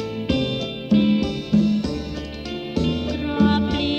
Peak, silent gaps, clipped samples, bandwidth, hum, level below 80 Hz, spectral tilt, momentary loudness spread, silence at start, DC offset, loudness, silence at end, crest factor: -6 dBFS; none; under 0.1%; 8.2 kHz; none; -38 dBFS; -7 dB/octave; 11 LU; 0 s; under 0.1%; -22 LUFS; 0 s; 16 dB